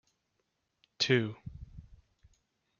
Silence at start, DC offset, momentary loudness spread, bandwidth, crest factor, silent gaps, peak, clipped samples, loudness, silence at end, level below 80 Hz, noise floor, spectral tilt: 1 s; under 0.1%; 23 LU; 7.2 kHz; 24 dB; none; -14 dBFS; under 0.1%; -30 LUFS; 0.85 s; -60 dBFS; -81 dBFS; -4 dB/octave